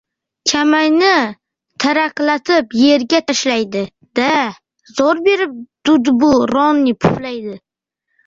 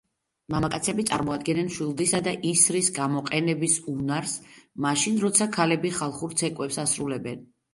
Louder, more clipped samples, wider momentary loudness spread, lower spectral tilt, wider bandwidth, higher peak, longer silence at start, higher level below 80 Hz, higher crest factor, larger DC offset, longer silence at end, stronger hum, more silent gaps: first, -14 LUFS vs -25 LUFS; neither; about the same, 11 LU vs 10 LU; about the same, -4 dB/octave vs -3.5 dB/octave; second, 7.8 kHz vs 12 kHz; about the same, -2 dBFS vs -4 dBFS; about the same, 0.45 s vs 0.5 s; first, -52 dBFS vs -58 dBFS; second, 14 dB vs 22 dB; neither; first, 0.7 s vs 0.3 s; neither; neither